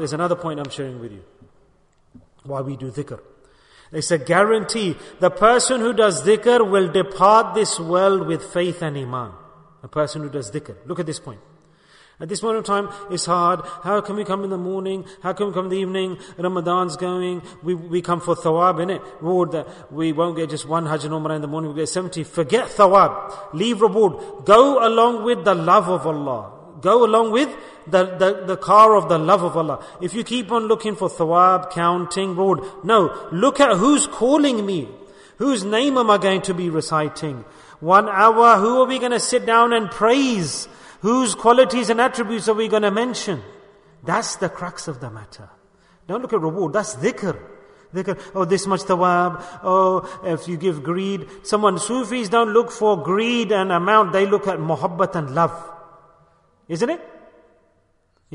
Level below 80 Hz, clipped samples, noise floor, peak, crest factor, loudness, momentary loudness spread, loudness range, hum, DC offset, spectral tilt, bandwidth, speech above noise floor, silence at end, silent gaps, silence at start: -58 dBFS; under 0.1%; -62 dBFS; 0 dBFS; 18 dB; -19 LUFS; 14 LU; 10 LU; none; under 0.1%; -4.5 dB/octave; 11 kHz; 43 dB; 1.25 s; none; 0 s